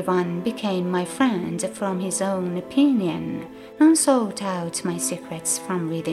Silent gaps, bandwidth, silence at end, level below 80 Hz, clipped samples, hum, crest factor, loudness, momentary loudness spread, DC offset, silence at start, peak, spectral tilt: none; 14.5 kHz; 0 s; -64 dBFS; under 0.1%; none; 16 dB; -23 LUFS; 9 LU; under 0.1%; 0 s; -6 dBFS; -4.5 dB/octave